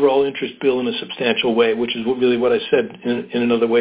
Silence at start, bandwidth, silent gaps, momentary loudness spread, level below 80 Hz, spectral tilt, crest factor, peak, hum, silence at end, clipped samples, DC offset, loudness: 0 s; 4 kHz; none; 6 LU; -58 dBFS; -9.5 dB/octave; 14 dB; -2 dBFS; none; 0 s; under 0.1%; under 0.1%; -19 LUFS